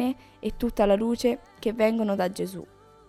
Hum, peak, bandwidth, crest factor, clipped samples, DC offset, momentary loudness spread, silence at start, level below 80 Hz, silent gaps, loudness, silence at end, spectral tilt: none; -10 dBFS; 15 kHz; 18 dB; under 0.1%; under 0.1%; 11 LU; 0 s; -46 dBFS; none; -26 LUFS; 0.45 s; -6 dB/octave